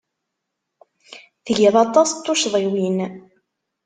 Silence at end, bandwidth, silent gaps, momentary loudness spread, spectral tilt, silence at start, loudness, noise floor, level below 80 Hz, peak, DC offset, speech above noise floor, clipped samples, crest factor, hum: 0.65 s; 9.6 kHz; none; 11 LU; -4 dB/octave; 1.1 s; -18 LUFS; -79 dBFS; -66 dBFS; -2 dBFS; under 0.1%; 61 dB; under 0.1%; 20 dB; none